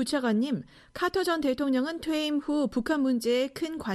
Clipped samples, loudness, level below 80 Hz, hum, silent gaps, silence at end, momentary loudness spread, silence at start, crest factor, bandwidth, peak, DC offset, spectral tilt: under 0.1%; -28 LUFS; -58 dBFS; none; none; 0 s; 5 LU; 0 s; 14 dB; 13.5 kHz; -12 dBFS; under 0.1%; -4.5 dB/octave